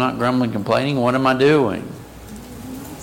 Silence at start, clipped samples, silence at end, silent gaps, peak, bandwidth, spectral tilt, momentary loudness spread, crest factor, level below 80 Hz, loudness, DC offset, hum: 0 s; under 0.1%; 0 s; none; -6 dBFS; 17 kHz; -6.5 dB/octave; 21 LU; 14 dB; -48 dBFS; -18 LUFS; under 0.1%; none